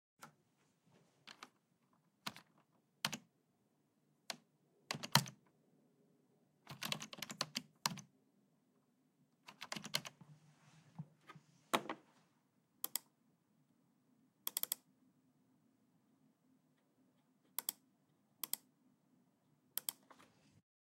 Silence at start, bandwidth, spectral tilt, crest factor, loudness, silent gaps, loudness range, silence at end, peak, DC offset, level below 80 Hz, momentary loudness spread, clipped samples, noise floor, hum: 0.2 s; 16 kHz; -2 dB/octave; 40 dB; -43 LUFS; none; 8 LU; 0.75 s; -10 dBFS; under 0.1%; under -90 dBFS; 22 LU; under 0.1%; -79 dBFS; none